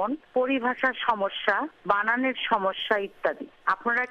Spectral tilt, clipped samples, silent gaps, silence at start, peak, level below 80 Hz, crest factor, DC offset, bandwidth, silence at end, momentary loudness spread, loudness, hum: -5.5 dB/octave; under 0.1%; none; 0 s; -6 dBFS; -64 dBFS; 20 dB; under 0.1%; 7.8 kHz; 0 s; 5 LU; -26 LUFS; none